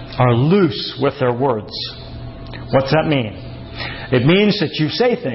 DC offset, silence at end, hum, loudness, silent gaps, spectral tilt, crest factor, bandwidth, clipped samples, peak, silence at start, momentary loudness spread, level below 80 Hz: under 0.1%; 0 s; none; -17 LUFS; none; -10 dB/octave; 14 dB; 5.8 kHz; under 0.1%; -4 dBFS; 0 s; 18 LU; -40 dBFS